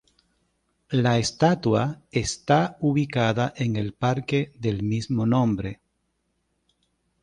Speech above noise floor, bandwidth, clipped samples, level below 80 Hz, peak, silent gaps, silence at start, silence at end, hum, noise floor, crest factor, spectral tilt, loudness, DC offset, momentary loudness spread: 50 dB; 11 kHz; under 0.1%; -52 dBFS; -6 dBFS; none; 0.9 s; 1.5 s; none; -74 dBFS; 18 dB; -6 dB/octave; -24 LUFS; under 0.1%; 6 LU